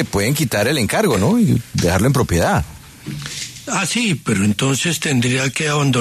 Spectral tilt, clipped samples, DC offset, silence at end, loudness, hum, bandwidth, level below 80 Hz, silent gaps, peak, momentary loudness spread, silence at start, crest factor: -4.5 dB/octave; under 0.1%; under 0.1%; 0 s; -17 LUFS; none; 14 kHz; -38 dBFS; none; -4 dBFS; 11 LU; 0 s; 14 dB